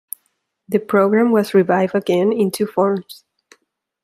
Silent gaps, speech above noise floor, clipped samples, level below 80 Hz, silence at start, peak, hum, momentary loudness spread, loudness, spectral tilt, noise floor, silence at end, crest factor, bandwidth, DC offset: none; 52 dB; under 0.1%; -68 dBFS; 0.7 s; -2 dBFS; none; 9 LU; -17 LUFS; -6.5 dB/octave; -69 dBFS; 0.9 s; 16 dB; 16 kHz; under 0.1%